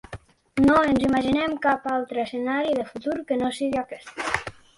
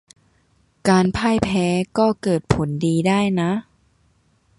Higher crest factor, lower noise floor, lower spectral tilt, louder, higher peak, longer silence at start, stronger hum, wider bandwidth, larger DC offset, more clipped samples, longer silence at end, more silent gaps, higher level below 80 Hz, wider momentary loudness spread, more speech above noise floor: about the same, 16 dB vs 20 dB; second, -43 dBFS vs -61 dBFS; about the same, -5.5 dB/octave vs -6.5 dB/octave; second, -24 LUFS vs -20 LUFS; second, -8 dBFS vs 0 dBFS; second, 0.1 s vs 0.85 s; neither; about the same, 11.5 kHz vs 11.5 kHz; neither; neither; second, 0.25 s vs 0.95 s; neither; second, -50 dBFS vs -44 dBFS; first, 12 LU vs 5 LU; second, 20 dB vs 42 dB